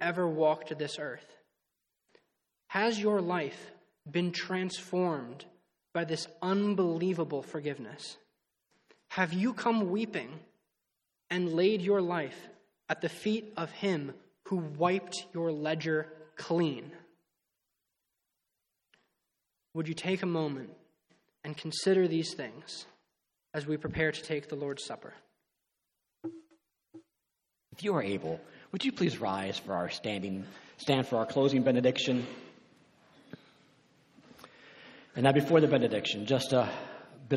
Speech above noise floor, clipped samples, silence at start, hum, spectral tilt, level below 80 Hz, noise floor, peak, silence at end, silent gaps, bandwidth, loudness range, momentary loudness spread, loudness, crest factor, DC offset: 54 dB; under 0.1%; 0 s; none; -5.5 dB/octave; -70 dBFS; -85 dBFS; -10 dBFS; 0 s; none; 13 kHz; 9 LU; 18 LU; -32 LUFS; 24 dB; under 0.1%